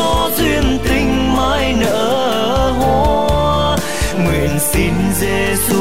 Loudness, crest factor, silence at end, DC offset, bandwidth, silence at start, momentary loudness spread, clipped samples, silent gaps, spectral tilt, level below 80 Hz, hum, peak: -15 LUFS; 10 dB; 0 s; 5%; 16.5 kHz; 0 s; 2 LU; under 0.1%; none; -4.5 dB/octave; -24 dBFS; none; -4 dBFS